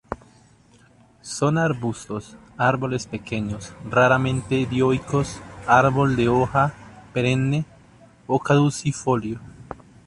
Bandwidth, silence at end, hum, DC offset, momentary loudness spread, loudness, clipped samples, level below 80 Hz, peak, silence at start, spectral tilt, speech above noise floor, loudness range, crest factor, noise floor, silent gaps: 11.5 kHz; 0.35 s; none; under 0.1%; 17 LU; -22 LUFS; under 0.1%; -48 dBFS; -4 dBFS; 0.1 s; -6 dB/octave; 33 dB; 5 LU; 20 dB; -54 dBFS; none